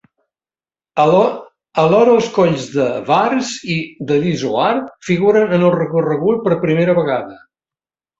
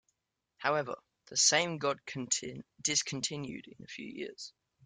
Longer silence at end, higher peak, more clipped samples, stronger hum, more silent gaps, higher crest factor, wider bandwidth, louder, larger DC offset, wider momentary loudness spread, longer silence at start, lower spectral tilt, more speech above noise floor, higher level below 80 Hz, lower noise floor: first, 0.85 s vs 0.35 s; first, 0 dBFS vs -14 dBFS; neither; neither; neither; second, 14 dB vs 22 dB; second, 8 kHz vs 11 kHz; first, -15 LUFS vs -32 LUFS; neither; second, 9 LU vs 20 LU; first, 0.95 s vs 0.6 s; first, -6.5 dB/octave vs -1.5 dB/octave; first, over 76 dB vs 49 dB; first, -56 dBFS vs -74 dBFS; first, under -90 dBFS vs -83 dBFS